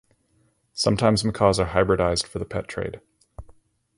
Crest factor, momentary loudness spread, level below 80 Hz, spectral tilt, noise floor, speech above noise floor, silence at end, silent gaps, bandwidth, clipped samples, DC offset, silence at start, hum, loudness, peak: 20 dB; 13 LU; -42 dBFS; -5 dB/octave; -65 dBFS; 43 dB; 0.45 s; none; 11.5 kHz; under 0.1%; under 0.1%; 0.75 s; none; -23 LUFS; -4 dBFS